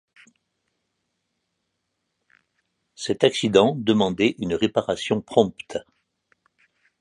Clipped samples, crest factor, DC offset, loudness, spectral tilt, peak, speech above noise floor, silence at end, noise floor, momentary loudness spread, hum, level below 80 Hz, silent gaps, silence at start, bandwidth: under 0.1%; 24 dB; under 0.1%; -22 LUFS; -5 dB/octave; -2 dBFS; 56 dB; 1.2 s; -77 dBFS; 15 LU; none; -58 dBFS; none; 3 s; 11 kHz